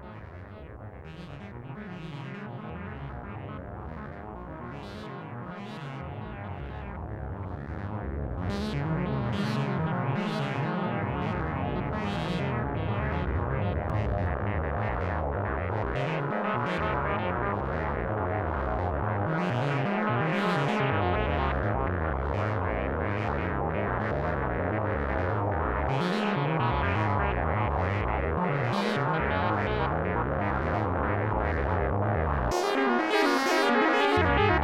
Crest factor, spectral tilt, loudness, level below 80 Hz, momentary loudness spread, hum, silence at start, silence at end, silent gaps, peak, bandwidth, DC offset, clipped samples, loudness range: 18 dB; -7 dB/octave; -29 LUFS; -40 dBFS; 13 LU; none; 0 s; 0 s; none; -10 dBFS; 14.5 kHz; under 0.1%; under 0.1%; 12 LU